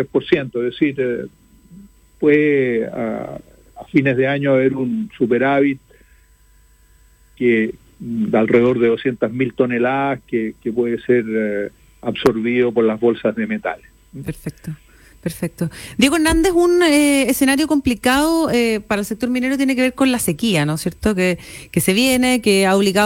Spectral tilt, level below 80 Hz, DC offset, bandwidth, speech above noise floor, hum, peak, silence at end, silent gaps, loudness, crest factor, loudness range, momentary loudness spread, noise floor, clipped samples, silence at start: -5 dB/octave; -42 dBFS; under 0.1%; 17 kHz; 34 dB; none; -2 dBFS; 0 s; none; -17 LUFS; 16 dB; 5 LU; 13 LU; -51 dBFS; under 0.1%; 0 s